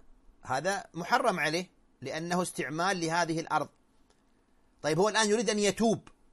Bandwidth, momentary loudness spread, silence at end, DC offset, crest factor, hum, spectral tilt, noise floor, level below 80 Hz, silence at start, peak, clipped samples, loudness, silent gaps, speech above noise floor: 13.5 kHz; 11 LU; 0.3 s; under 0.1%; 20 dB; none; -4 dB/octave; -66 dBFS; -64 dBFS; 0.1 s; -12 dBFS; under 0.1%; -30 LUFS; none; 37 dB